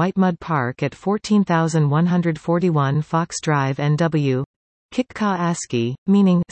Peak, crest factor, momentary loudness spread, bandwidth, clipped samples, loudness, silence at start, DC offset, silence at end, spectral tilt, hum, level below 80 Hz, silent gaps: -6 dBFS; 12 dB; 7 LU; 8.8 kHz; under 0.1%; -20 LUFS; 0 s; under 0.1%; 0.1 s; -6.5 dB/octave; none; -58 dBFS; 4.46-4.89 s, 5.98-6.06 s